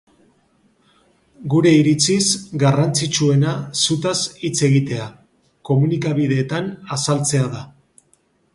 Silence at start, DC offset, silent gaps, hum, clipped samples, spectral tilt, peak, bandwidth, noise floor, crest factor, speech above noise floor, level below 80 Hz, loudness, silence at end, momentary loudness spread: 1.4 s; under 0.1%; none; none; under 0.1%; -5 dB/octave; -2 dBFS; 11.5 kHz; -60 dBFS; 16 dB; 43 dB; -56 dBFS; -18 LUFS; 0.85 s; 11 LU